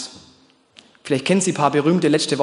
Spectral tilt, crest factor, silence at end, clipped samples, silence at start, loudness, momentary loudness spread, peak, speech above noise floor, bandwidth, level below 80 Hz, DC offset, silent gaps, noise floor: -4.5 dB/octave; 18 dB; 0 s; under 0.1%; 0 s; -18 LUFS; 13 LU; -2 dBFS; 36 dB; 11 kHz; -64 dBFS; under 0.1%; none; -54 dBFS